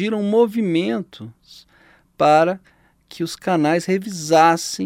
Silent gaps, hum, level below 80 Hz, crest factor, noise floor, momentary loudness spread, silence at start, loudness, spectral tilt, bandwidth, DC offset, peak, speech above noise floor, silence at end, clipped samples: none; none; -64 dBFS; 18 dB; -51 dBFS; 16 LU; 0 s; -18 LUFS; -5 dB/octave; 16.5 kHz; under 0.1%; -2 dBFS; 32 dB; 0 s; under 0.1%